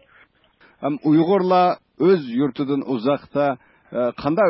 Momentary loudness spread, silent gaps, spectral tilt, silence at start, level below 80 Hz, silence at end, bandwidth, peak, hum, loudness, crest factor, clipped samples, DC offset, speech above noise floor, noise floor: 9 LU; none; -12 dB/octave; 0.8 s; -60 dBFS; 0 s; 5.8 kHz; -6 dBFS; none; -20 LUFS; 14 dB; under 0.1%; under 0.1%; 37 dB; -56 dBFS